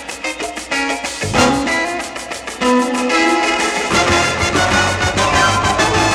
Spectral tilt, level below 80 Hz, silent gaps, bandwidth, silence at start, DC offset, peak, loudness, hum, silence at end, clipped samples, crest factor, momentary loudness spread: -3.5 dB/octave; -36 dBFS; none; 16 kHz; 0 s; under 0.1%; 0 dBFS; -15 LUFS; none; 0 s; under 0.1%; 16 dB; 10 LU